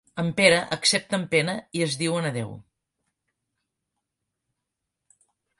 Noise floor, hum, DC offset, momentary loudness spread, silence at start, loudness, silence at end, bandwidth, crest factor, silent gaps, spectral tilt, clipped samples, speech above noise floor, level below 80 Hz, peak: -83 dBFS; none; under 0.1%; 10 LU; 0.15 s; -23 LUFS; 3 s; 11.5 kHz; 26 dB; none; -3.5 dB/octave; under 0.1%; 59 dB; -64 dBFS; -2 dBFS